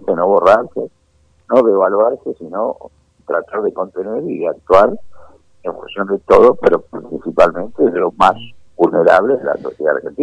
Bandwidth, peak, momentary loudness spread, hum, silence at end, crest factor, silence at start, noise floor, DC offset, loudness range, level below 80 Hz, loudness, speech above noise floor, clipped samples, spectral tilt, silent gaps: 9.8 kHz; 0 dBFS; 16 LU; none; 0 s; 14 dB; 0.05 s; -55 dBFS; under 0.1%; 4 LU; -46 dBFS; -14 LUFS; 41 dB; 0.3%; -6.5 dB/octave; none